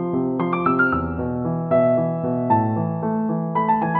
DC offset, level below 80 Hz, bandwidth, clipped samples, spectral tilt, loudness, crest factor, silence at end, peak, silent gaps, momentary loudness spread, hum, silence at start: under 0.1%; -46 dBFS; 4.3 kHz; under 0.1%; -8 dB/octave; -21 LUFS; 14 dB; 0 s; -6 dBFS; none; 6 LU; none; 0 s